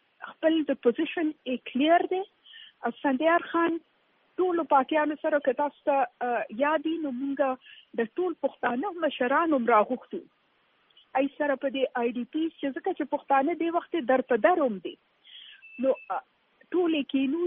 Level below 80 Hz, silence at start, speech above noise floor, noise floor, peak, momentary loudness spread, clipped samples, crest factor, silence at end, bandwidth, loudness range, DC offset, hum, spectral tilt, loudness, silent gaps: -78 dBFS; 0.2 s; 41 dB; -68 dBFS; -8 dBFS; 13 LU; under 0.1%; 20 dB; 0 s; 3.8 kHz; 2 LU; under 0.1%; none; -2 dB/octave; -27 LUFS; none